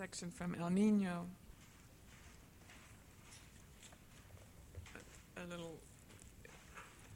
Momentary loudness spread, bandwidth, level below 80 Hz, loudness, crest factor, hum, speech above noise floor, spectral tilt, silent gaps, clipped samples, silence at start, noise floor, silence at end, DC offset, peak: 24 LU; 16.5 kHz; -66 dBFS; -41 LUFS; 20 dB; none; 22 dB; -6 dB/octave; none; under 0.1%; 0 s; -62 dBFS; 0 s; under 0.1%; -26 dBFS